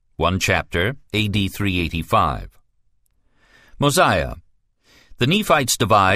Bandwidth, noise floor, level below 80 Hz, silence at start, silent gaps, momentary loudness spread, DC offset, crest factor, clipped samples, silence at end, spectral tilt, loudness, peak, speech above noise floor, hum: 15.5 kHz; -61 dBFS; -38 dBFS; 0.2 s; none; 7 LU; under 0.1%; 18 dB; under 0.1%; 0 s; -4 dB/octave; -19 LUFS; -2 dBFS; 43 dB; none